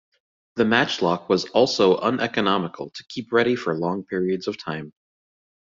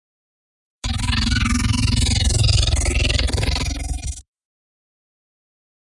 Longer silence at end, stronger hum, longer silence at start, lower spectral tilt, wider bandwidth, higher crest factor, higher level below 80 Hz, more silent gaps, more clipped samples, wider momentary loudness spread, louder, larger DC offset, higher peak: second, 0.75 s vs 1.8 s; neither; second, 0.55 s vs 0.85 s; about the same, -5 dB/octave vs -4 dB/octave; second, 7.6 kHz vs 11.5 kHz; first, 22 dB vs 16 dB; second, -62 dBFS vs -24 dBFS; neither; neither; first, 14 LU vs 11 LU; about the same, -22 LUFS vs -20 LUFS; neither; about the same, -2 dBFS vs -4 dBFS